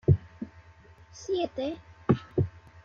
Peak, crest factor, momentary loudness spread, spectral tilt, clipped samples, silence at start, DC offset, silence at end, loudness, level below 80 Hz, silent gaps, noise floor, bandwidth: -8 dBFS; 22 dB; 16 LU; -8 dB/octave; under 0.1%; 0.1 s; under 0.1%; 0.35 s; -30 LUFS; -52 dBFS; none; -54 dBFS; 7.2 kHz